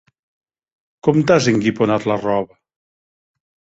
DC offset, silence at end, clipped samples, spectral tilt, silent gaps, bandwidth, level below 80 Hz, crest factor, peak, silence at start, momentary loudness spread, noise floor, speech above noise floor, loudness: under 0.1%; 1.35 s; under 0.1%; -6 dB/octave; none; 8 kHz; -54 dBFS; 18 dB; -2 dBFS; 1.05 s; 8 LU; under -90 dBFS; over 74 dB; -17 LUFS